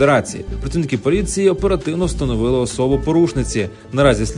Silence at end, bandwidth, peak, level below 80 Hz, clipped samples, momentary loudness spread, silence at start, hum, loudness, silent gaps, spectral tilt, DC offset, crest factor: 0 s; 11 kHz; 0 dBFS; -28 dBFS; under 0.1%; 8 LU; 0 s; none; -18 LUFS; none; -6 dB/octave; under 0.1%; 16 dB